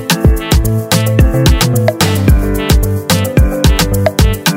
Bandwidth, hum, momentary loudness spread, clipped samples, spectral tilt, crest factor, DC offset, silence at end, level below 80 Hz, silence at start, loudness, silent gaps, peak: 18.5 kHz; none; 2 LU; 0.5%; -5 dB/octave; 10 dB; under 0.1%; 0 s; -14 dBFS; 0 s; -11 LUFS; none; 0 dBFS